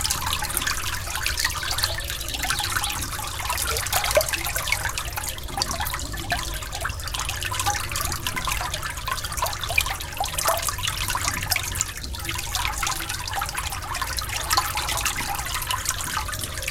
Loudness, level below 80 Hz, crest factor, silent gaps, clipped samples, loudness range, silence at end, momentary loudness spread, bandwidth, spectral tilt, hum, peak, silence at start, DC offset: -25 LUFS; -36 dBFS; 24 dB; none; under 0.1%; 3 LU; 0 s; 6 LU; 17 kHz; -1.5 dB/octave; none; -2 dBFS; 0 s; under 0.1%